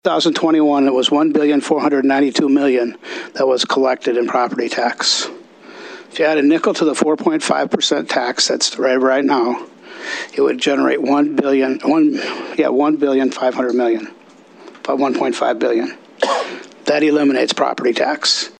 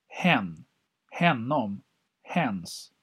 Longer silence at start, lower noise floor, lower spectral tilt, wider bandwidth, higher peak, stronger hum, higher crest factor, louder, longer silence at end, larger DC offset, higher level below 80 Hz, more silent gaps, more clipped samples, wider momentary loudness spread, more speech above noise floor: about the same, 0.05 s vs 0.1 s; second, -42 dBFS vs -47 dBFS; second, -3 dB/octave vs -5.5 dB/octave; second, 9.8 kHz vs 13.5 kHz; first, 0 dBFS vs -6 dBFS; neither; second, 16 dB vs 24 dB; first, -16 LUFS vs -27 LUFS; about the same, 0.1 s vs 0.15 s; neither; about the same, -70 dBFS vs -72 dBFS; neither; neither; second, 9 LU vs 16 LU; first, 27 dB vs 20 dB